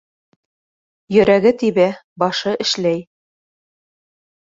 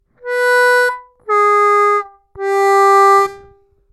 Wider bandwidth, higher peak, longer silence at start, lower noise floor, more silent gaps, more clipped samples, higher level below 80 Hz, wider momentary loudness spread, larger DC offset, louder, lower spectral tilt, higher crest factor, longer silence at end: second, 7.8 kHz vs 15 kHz; about the same, -2 dBFS vs -4 dBFS; first, 1.1 s vs 0.25 s; first, under -90 dBFS vs -48 dBFS; first, 2.04-2.16 s vs none; neither; about the same, -56 dBFS vs -58 dBFS; second, 8 LU vs 12 LU; neither; second, -17 LUFS vs -12 LUFS; first, -5 dB/octave vs -2 dB/octave; first, 18 dB vs 10 dB; first, 1.5 s vs 0.55 s